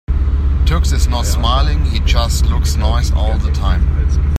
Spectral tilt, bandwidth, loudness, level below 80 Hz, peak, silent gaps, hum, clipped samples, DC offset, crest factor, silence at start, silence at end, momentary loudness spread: -5 dB/octave; 14 kHz; -15 LUFS; -14 dBFS; -2 dBFS; none; none; under 0.1%; under 0.1%; 12 dB; 0.1 s; 0 s; 2 LU